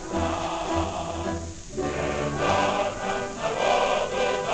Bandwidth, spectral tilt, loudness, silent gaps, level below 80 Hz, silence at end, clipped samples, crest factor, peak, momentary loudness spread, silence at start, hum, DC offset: 9.6 kHz; -4.5 dB/octave; -26 LUFS; none; -42 dBFS; 0 s; under 0.1%; 18 dB; -8 dBFS; 8 LU; 0 s; none; under 0.1%